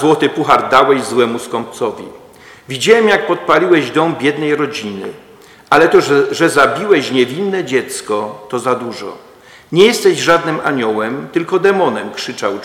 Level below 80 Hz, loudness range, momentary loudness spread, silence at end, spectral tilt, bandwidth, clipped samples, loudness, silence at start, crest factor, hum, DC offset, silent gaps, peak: -54 dBFS; 2 LU; 13 LU; 0 s; -4.5 dB/octave; 16.5 kHz; 0.5%; -13 LUFS; 0 s; 14 dB; none; under 0.1%; none; 0 dBFS